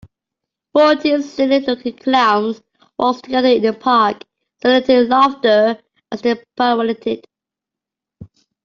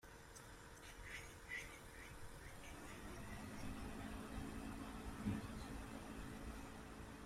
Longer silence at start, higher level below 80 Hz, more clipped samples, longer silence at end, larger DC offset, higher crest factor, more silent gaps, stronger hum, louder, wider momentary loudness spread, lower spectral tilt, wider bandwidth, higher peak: first, 0.75 s vs 0.05 s; about the same, -58 dBFS vs -58 dBFS; neither; first, 0.4 s vs 0 s; neither; second, 14 dB vs 20 dB; neither; neither; first, -16 LUFS vs -52 LUFS; about the same, 11 LU vs 9 LU; about the same, -5 dB/octave vs -5 dB/octave; second, 7.2 kHz vs 16 kHz; first, -2 dBFS vs -32 dBFS